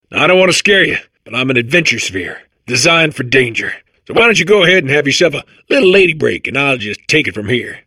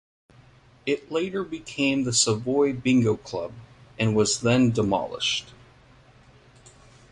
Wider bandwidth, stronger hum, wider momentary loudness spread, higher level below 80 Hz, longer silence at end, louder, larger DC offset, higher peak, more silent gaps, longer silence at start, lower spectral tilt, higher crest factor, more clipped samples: first, 15 kHz vs 11.5 kHz; neither; about the same, 12 LU vs 11 LU; first, -48 dBFS vs -56 dBFS; second, 0.1 s vs 1.6 s; first, -11 LUFS vs -24 LUFS; neither; first, 0 dBFS vs -8 dBFS; neither; second, 0.1 s vs 0.85 s; about the same, -3.5 dB/octave vs -4.5 dB/octave; second, 12 dB vs 18 dB; neither